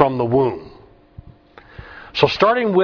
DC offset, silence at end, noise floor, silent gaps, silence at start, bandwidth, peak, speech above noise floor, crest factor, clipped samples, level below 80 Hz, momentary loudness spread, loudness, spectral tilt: under 0.1%; 0 s; -45 dBFS; none; 0 s; 5.4 kHz; 0 dBFS; 29 dB; 20 dB; under 0.1%; -48 dBFS; 21 LU; -17 LUFS; -7 dB/octave